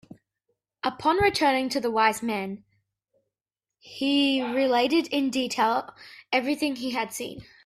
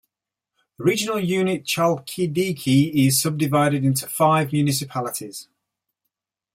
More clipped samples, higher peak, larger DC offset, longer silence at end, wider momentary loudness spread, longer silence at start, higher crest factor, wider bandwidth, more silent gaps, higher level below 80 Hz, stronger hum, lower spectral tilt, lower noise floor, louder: neither; about the same, -8 dBFS vs -6 dBFS; neither; second, 0.25 s vs 1.1 s; about the same, 11 LU vs 9 LU; about the same, 0.85 s vs 0.8 s; about the same, 18 dB vs 16 dB; about the same, 15 kHz vs 16.5 kHz; neither; about the same, -60 dBFS vs -62 dBFS; neither; second, -3.5 dB/octave vs -5 dB/octave; first, under -90 dBFS vs -86 dBFS; second, -25 LUFS vs -21 LUFS